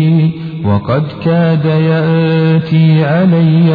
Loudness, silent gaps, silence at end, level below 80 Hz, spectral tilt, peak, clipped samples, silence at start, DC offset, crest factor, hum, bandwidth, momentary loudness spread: -11 LUFS; none; 0 s; -48 dBFS; -10.5 dB/octave; 0 dBFS; under 0.1%; 0 s; under 0.1%; 10 dB; none; 4.9 kHz; 6 LU